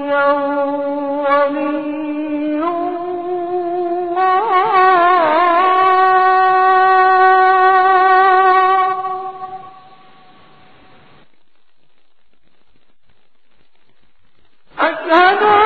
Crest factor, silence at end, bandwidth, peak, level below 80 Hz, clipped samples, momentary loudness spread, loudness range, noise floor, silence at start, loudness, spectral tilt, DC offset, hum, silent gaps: 14 dB; 0 s; 4.8 kHz; 0 dBFS; -62 dBFS; under 0.1%; 11 LU; 10 LU; -63 dBFS; 0 s; -13 LUFS; -6 dB/octave; 0.7%; none; none